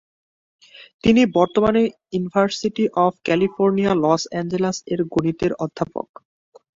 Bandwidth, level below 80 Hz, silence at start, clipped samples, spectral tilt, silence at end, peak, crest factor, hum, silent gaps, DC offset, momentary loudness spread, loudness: 7.8 kHz; -50 dBFS; 0.8 s; under 0.1%; -6 dB/octave; 0.75 s; -2 dBFS; 18 dB; none; 0.94-0.99 s; under 0.1%; 9 LU; -20 LUFS